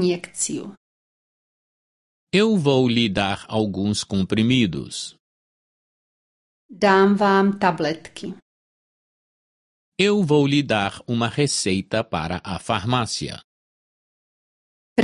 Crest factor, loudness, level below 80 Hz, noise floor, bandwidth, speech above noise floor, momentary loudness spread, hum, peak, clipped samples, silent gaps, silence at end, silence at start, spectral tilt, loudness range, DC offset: 20 dB; -21 LUFS; -50 dBFS; under -90 dBFS; 11.5 kHz; over 69 dB; 14 LU; none; -2 dBFS; under 0.1%; 0.77-2.27 s, 5.20-6.69 s, 8.42-9.92 s, 13.44-14.96 s; 0 s; 0 s; -5 dB/octave; 4 LU; under 0.1%